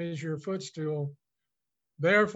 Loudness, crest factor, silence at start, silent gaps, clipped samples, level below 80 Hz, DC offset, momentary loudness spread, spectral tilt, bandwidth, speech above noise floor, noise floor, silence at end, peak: -31 LUFS; 18 dB; 0 s; none; under 0.1%; -78 dBFS; under 0.1%; 11 LU; -6 dB/octave; 8.2 kHz; 59 dB; -88 dBFS; 0 s; -12 dBFS